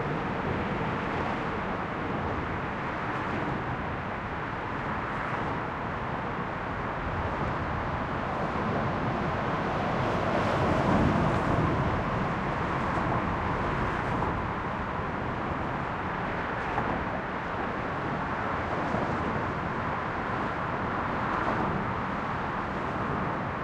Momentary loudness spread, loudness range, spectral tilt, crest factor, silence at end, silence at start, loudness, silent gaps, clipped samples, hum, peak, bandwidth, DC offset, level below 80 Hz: 6 LU; 5 LU; -7.5 dB/octave; 16 dB; 0 s; 0 s; -30 LUFS; none; under 0.1%; none; -12 dBFS; 10.5 kHz; under 0.1%; -44 dBFS